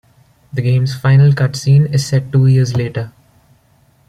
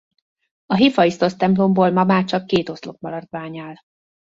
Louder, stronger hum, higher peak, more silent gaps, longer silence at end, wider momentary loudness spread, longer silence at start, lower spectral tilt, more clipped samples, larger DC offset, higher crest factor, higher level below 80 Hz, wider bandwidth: first, -13 LUFS vs -18 LUFS; neither; about the same, -2 dBFS vs -2 dBFS; neither; first, 1 s vs 0.55 s; second, 12 LU vs 16 LU; second, 0.55 s vs 0.7 s; about the same, -7 dB/octave vs -7 dB/octave; neither; neither; about the same, 12 dB vs 16 dB; first, -48 dBFS vs -58 dBFS; first, 11.5 kHz vs 7.6 kHz